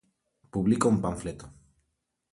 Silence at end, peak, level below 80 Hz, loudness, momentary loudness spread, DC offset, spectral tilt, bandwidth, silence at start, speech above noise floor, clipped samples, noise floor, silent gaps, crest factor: 0.85 s; -10 dBFS; -52 dBFS; -27 LUFS; 15 LU; under 0.1%; -6.5 dB/octave; 11.5 kHz; 0.55 s; 53 dB; under 0.1%; -79 dBFS; none; 20 dB